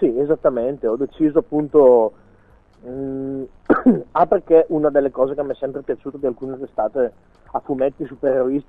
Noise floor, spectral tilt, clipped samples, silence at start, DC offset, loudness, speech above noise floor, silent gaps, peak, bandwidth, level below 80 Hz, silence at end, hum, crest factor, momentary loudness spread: -51 dBFS; -10 dB/octave; under 0.1%; 0 s; under 0.1%; -19 LUFS; 33 dB; none; -2 dBFS; 3.8 kHz; -50 dBFS; 0.05 s; none; 18 dB; 13 LU